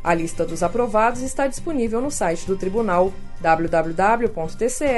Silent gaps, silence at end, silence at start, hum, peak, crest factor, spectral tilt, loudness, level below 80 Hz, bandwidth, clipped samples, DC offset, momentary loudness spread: none; 0 s; 0 s; none; -4 dBFS; 16 dB; -5 dB/octave; -21 LUFS; -34 dBFS; 11.5 kHz; under 0.1%; under 0.1%; 6 LU